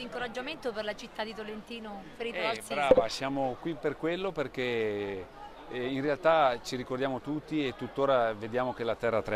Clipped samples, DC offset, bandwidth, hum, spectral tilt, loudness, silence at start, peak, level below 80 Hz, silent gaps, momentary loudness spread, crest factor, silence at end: under 0.1%; under 0.1%; 14.5 kHz; none; -5 dB/octave; -31 LUFS; 0 s; -8 dBFS; -58 dBFS; none; 15 LU; 24 dB; 0 s